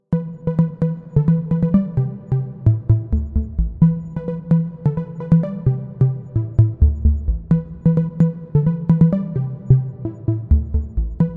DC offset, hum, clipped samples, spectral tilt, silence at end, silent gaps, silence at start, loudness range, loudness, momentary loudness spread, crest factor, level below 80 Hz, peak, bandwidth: under 0.1%; none; under 0.1%; -13 dB/octave; 0 s; none; 0.1 s; 2 LU; -19 LUFS; 7 LU; 16 dB; -26 dBFS; -2 dBFS; 2.5 kHz